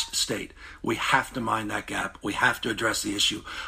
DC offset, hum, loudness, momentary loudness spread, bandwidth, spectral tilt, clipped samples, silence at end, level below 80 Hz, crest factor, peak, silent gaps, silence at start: under 0.1%; none; -26 LUFS; 8 LU; 15.5 kHz; -2 dB/octave; under 0.1%; 0 s; -52 dBFS; 20 dB; -6 dBFS; none; 0 s